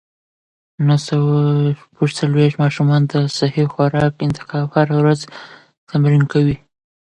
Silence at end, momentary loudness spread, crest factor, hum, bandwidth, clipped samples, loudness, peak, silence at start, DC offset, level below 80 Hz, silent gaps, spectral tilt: 0.45 s; 7 LU; 16 dB; none; 9.8 kHz; under 0.1%; -16 LUFS; -2 dBFS; 0.8 s; under 0.1%; -50 dBFS; 5.78-5.87 s; -7.5 dB/octave